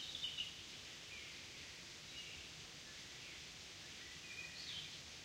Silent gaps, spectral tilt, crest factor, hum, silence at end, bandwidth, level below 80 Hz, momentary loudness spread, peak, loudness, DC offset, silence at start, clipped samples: none; -1 dB/octave; 20 dB; none; 0 s; 16 kHz; -72 dBFS; 7 LU; -32 dBFS; -49 LUFS; under 0.1%; 0 s; under 0.1%